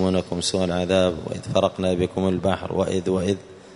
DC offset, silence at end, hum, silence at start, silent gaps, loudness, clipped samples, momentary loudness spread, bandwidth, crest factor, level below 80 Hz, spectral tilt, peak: under 0.1%; 0 s; none; 0 s; none; -23 LUFS; under 0.1%; 4 LU; 11 kHz; 18 dB; -48 dBFS; -5.5 dB/octave; -4 dBFS